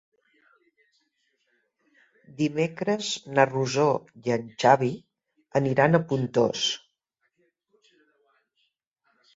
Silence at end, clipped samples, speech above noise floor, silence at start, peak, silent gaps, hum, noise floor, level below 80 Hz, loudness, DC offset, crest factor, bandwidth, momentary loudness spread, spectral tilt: 2.6 s; under 0.1%; 52 dB; 2.4 s; -4 dBFS; none; none; -76 dBFS; -68 dBFS; -25 LUFS; under 0.1%; 24 dB; 8 kHz; 9 LU; -5 dB/octave